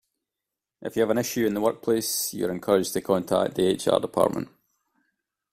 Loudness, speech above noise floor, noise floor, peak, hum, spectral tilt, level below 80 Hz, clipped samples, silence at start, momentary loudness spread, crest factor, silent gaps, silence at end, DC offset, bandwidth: -25 LUFS; 63 dB; -87 dBFS; -6 dBFS; none; -4.5 dB/octave; -62 dBFS; under 0.1%; 0.8 s; 7 LU; 20 dB; none; 1.05 s; under 0.1%; 16 kHz